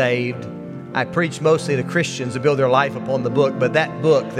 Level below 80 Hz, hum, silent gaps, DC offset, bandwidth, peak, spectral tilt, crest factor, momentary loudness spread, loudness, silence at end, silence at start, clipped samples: -62 dBFS; none; none; under 0.1%; 12.5 kHz; -2 dBFS; -6 dB/octave; 18 dB; 9 LU; -19 LUFS; 0 s; 0 s; under 0.1%